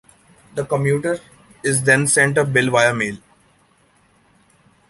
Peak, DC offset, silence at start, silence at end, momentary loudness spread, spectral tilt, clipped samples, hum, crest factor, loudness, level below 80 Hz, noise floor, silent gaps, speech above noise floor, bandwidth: -2 dBFS; under 0.1%; 0.55 s; 1.75 s; 14 LU; -4 dB/octave; under 0.1%; none; 20 dB; -17 LUFS; -56 dBFS; -57 dBFS; none; 40 dB; 11.5 kHz